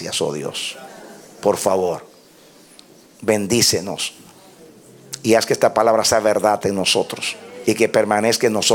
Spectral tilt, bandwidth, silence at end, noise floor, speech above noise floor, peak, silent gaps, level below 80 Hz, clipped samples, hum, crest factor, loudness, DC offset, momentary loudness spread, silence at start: -3 dB/octave; 18 kHz; 0 s; -48 dBFS; 30 dB; -2 dBFS; none; -58 dBFS; under 0.1%; none; 18 dB; -18 LUFS; under 0.1%; 11 LU; 0 s